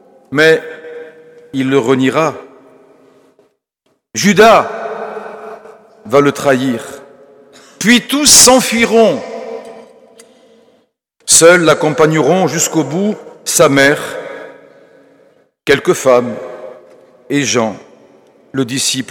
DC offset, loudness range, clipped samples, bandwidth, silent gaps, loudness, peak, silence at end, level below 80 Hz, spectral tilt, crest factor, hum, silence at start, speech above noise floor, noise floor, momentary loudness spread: under 0.1%; 7 LU; 0.3%; over 20 kHz; none; -11 LUFS; 0 dBFS; 0.05 s; -48 dBFS; -3 dB/octave; 14 dB; none; 0.3 s; 52 dB; -63 dBFS; 22 LU